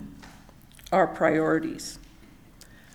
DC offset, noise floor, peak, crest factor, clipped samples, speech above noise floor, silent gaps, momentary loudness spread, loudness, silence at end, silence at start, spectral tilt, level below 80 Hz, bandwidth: under 0.1%; -51 dBFS; -8 dBFS; 20 dB; under 0.1%; 27 dB; none; 23 LU; -25 LUFS; 0.9 s; 0 s; -5.5 dB/octave; -54 dBFS; 19 kHz